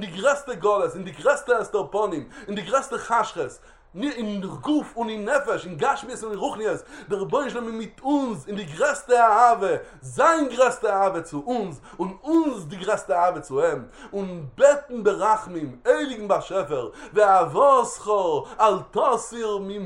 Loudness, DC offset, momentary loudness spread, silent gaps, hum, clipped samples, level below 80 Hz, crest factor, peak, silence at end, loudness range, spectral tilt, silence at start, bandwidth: -23 LUFS; under 0.1%; 14 LU; none; none; under 0.1%; -56 dBFS; 20 dB; -4 dBFS; 0 s; 6 LU; -4.5 dB/octave; 0 s; 11.5 kHz